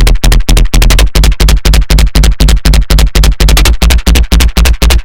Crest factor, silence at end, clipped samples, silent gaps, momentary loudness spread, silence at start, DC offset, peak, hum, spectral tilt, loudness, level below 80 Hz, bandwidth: 6 dB; 0 s; 9%; none; 2 LU; 0 s; 8%; 0 dBFS; none; -4 dB/octave; -8 LUFS; -6 dBFS; 17.5 kHz